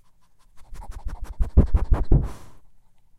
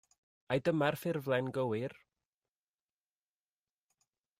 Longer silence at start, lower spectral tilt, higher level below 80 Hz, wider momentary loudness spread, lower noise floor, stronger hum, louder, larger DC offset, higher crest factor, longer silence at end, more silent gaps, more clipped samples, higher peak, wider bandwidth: about the same, 0.55 s vs 0.5 s; first, -9.5 dB/octave vs -6.5 dB/octave; first, -24 dBFS vs -74 dBFS; first, 22 LU vs 6 LU; second, -56 dBFS vs under -90 dBFS; neither; first, -24 LUFS vs -35 LUFS; neither; about the same, 16 dB vs 20 dB; second, 0.4 s vs 2.45 s; neither; neither; first, -6 dBFS vs -18 dBFS; second, 6.2 kHz vs 15.5 kHz